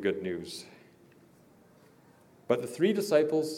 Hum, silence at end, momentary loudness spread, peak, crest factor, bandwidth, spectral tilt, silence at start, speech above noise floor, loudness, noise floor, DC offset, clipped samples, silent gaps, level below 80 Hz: none; 0 s; 17 LU; -12 dBFS; 20 dB; 16.5 kHz; -5.5 dB/octave; 0 s; 31 dB; -29 LUFS; -60 dBFS; under 0.1%; under 0.1%; none; -78 dBFS